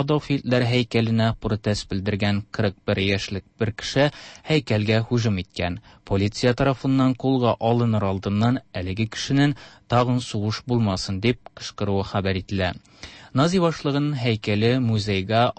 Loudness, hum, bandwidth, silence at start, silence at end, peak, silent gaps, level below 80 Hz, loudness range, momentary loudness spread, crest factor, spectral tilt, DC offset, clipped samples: -23 LUFS; none; 8.8 kHz; 0 s; 0.05 s; -8 dBFS; none; -48 dBFS; 2 LU; 7 LU; 14 dB; -6.5 dB/octave; under 0.1%; under 0.1%